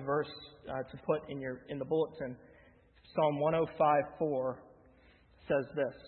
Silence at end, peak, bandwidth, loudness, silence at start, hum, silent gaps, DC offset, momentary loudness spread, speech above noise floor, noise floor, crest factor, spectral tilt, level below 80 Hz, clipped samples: 0 s; -16 dBFS; 4.3 kHz; -34 LUFS; 0 s; none; none; under 0.1%; 14 LU; 29 dB; -63 dBFS; 18 dB; -5.5 dB/octave; -66 dBFS; under 0.1%